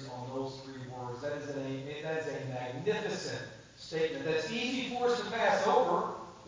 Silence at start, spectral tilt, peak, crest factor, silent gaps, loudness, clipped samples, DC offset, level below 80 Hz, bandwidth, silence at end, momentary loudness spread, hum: 0 s; -4.5 dB/octave; -14 dBFS; 20 dB; none; -34 LUFS; under 0.1%; under 0.1%; -68 dBFS; 7.6 kHz; 0 s; 14 LU; none